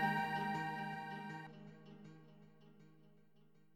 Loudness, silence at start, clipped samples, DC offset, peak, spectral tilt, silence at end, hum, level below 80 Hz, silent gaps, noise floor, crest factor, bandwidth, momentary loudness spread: -43 LUFS; 0 s; under 0.1%; under 0.1%; -24 dBFS; -6 dB/octave; 0.6 s; none; -84 dBFS; none; -71 dBFS; 22 dB; 16.5 kHz; 26 LU